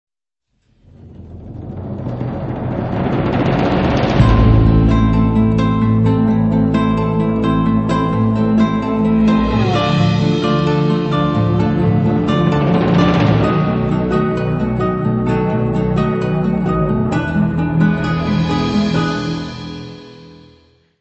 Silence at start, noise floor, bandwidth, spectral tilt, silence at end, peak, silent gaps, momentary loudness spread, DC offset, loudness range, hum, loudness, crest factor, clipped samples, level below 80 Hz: 1.05 s; -71 dBFS; 8.2 kHz; -8.5 dB/octave; 0.7 s; 0 dBFS; none; 10 LU; under 0.1%; 5 LU; none; -15 LUFS; 14 dB; under 0.1%; -28 dBFS